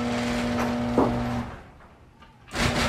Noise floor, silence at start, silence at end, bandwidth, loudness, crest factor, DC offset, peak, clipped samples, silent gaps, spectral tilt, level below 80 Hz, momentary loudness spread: -51 dBFS; 0 s; 0 s; 15 kHz; -26 LUFS; 18 dB; under 0.1%; -8 dBFS; under 0.1%; none; -5 dB/octave; -40 dBFS; 12 LU